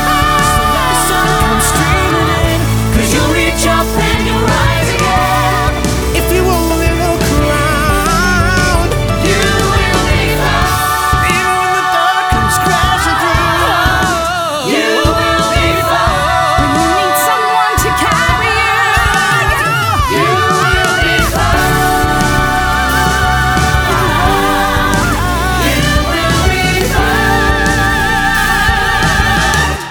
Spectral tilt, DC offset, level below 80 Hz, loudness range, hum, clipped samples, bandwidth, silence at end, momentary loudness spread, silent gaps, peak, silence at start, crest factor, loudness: -4 dB/octave; under 0.1%; -20 dBFS; 1 LU; none; under 0.1%; over 20 kHz; 0 s; 2 LU; none; 0 dBFS; 0 s; 12 dB; -11 LUFS